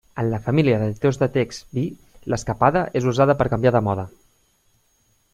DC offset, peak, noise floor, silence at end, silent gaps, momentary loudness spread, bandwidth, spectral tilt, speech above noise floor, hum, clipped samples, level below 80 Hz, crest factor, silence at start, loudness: under 0.1%; -2 dBFS; -63 dBFS; 1.25 s; none; 10 LU; 12.5 kHz; -7 dB/octave; 43 dB; none; under 0.1%; -46 dBFS; 18 dB; 0.15 s; -21 LUFS